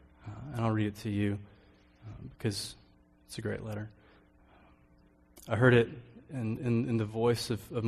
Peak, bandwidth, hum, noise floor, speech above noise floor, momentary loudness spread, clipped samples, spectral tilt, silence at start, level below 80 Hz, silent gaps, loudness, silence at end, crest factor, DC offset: -10 dBFS; 14 kHz; none; -63 dBFS; 32 dB; 21 LU; under 0.1%; -6.5 dB/octave; 0.2 s; -60 dBFS; none; -32 LUFS; 0 s; 22 dB; under 0.1%